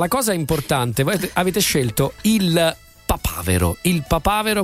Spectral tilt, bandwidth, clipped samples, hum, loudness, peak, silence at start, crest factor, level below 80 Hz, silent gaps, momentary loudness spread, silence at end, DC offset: -4.5 dB/octave; 16 kHz; under 0.1%; none; -19 LUFS; -2 dBFS; 0 s; 16 dB; -34 dBFS; none; 5 LU; 0 s; under 0.1%